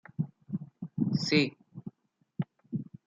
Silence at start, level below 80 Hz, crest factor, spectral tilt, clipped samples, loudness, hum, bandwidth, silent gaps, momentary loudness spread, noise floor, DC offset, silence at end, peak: 0.2 s; -70 dBFS; 22 dB; -6 dB/octave; under 0.1%; -32 LUFS; none; 7.8 kHz; none; 21 LU; -69 dBFS; under 0.1%; 0.25 s; -12 dBFS